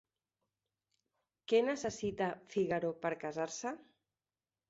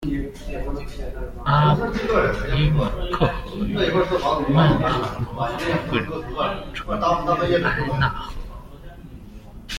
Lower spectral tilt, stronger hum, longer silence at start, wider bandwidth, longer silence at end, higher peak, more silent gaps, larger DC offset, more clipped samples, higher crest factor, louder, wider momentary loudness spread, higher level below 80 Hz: second, -4.5 dB/octave vs -7 dB/octave; neither; first, 1.5 s vs 0 s; second, 8 kHz vs 13.5 kHz; first, 0.85 s vs 0 s; second, -18 dBFS vs -4 dBFS; neither; neither; neither; about the same, 20 dB vs 18 dB; second, -37 LUFS vs -22 LUFS; second, 11 LU vs 22 LU; second, -72 dBFS vs -32 dBFS